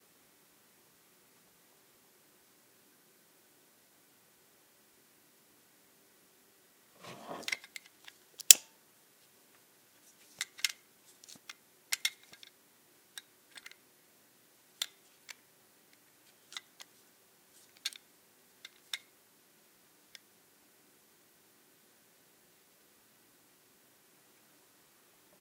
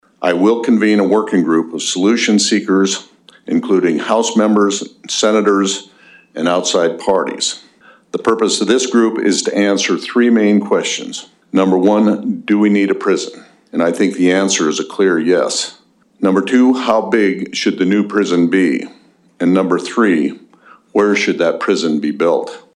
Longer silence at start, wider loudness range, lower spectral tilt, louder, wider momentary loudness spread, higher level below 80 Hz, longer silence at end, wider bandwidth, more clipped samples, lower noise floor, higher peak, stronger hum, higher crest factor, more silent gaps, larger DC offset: first, 7.05 s vs 0.2 s; first, 20 LU vs 2 LU; second, 2.5 dB/octave vs -4 dB/octave; second, -30 LUFS vs -14 LUFS; first, 21 LU vs 7 LU; second, under -90 dBFS vs -64 dBFS; first, 6.45 s vs 0.15 s; first, 17 kHz vs 11.5 kHz; neither; first, -66 dBFS vs -46 dBFS; about the same, 0 dBFS vs -2 dBFS; neither; first, 42 dB vs 12 dB; neither; neither